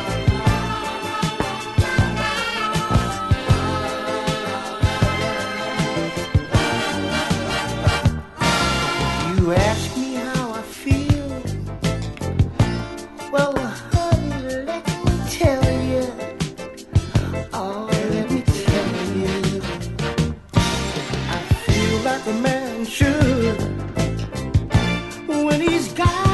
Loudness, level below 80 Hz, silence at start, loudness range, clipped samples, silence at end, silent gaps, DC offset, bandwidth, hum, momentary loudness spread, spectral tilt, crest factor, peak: -21 LUFS; -32 dBFS; 0 s; 2 LU; under 0.1%; 0 s; none; under 0.1%; 12 kHz; none; 7 LU; -5.5 dB/octave; 18 dB; -2 dBFS